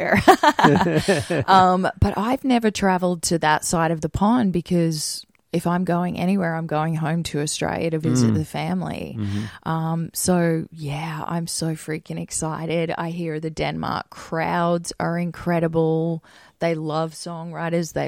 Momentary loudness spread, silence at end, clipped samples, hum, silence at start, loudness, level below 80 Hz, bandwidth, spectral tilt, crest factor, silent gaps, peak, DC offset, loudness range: 12 LU; 0 s; under 0.1%; none; 0 s; -22 LUFS; -46 dBFS; 16.5 kHz; -5.5 dB/octave; 22 dB; none; 0 dBFS; under 0.1%; 6 LU